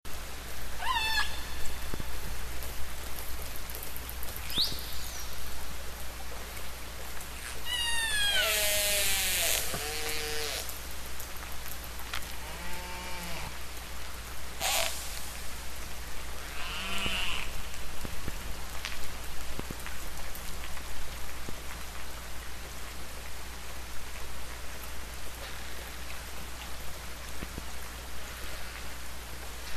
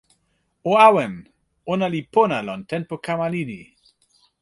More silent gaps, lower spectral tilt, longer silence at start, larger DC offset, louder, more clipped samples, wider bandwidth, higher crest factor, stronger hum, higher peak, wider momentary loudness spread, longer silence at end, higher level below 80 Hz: neither; second, -1.5 dB/octave vs -6.5 dB/octave; second, 0 s vs 0.65 s; first, 1% vs under 0.1%; second, -35 LUFS vs -20 LUFS; neither; first, 14 kHz vs 11.5 kHz; about the same, 20 dB vs 20 dB; neither; second, -12 dBFS vs -2 dBFS; second, 14 LU vs 18 LU; second, 0 s vs 0.8 s; first, -42 dBFS vs -62 dBFS